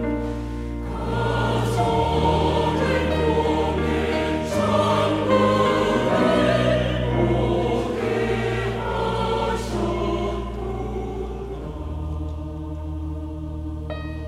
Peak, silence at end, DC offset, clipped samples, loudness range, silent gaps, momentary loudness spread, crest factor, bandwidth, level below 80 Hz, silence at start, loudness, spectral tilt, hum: -6 dBFS; 0 s; under 0.1%; under 0.1%; 9 LU; none; 12 LU; 16 dB; 14.5 kHz; -34 dBFS; 0 s; -23 LUFS; -6.5 dB/octave; none